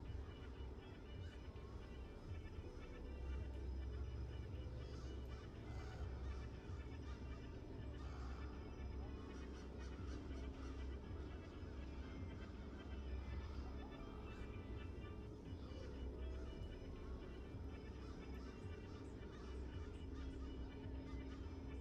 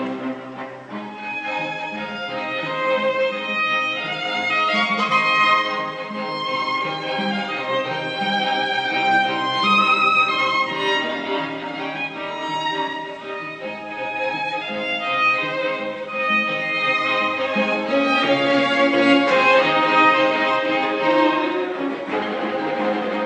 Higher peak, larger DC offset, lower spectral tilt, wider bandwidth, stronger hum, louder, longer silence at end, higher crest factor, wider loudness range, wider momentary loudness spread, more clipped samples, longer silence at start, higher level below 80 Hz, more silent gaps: second, -38 dBFS vs -2 dBFS; neither; first, -7 dB/octave vs -4.5 dB/octave; second, 8 kHz vs 9.4 kHz; neither; second, -53 LUFS vs -20 LUFS; about the same, 0 s vs 0 s; about the same, 14 dB vs 18 dB; second, 2 LU vs 8 LU; second, 4 LU vs 12 LU; neither; about the same, 0 s vs 0 s; first, -52 dBFS vs -72 dBFS; neither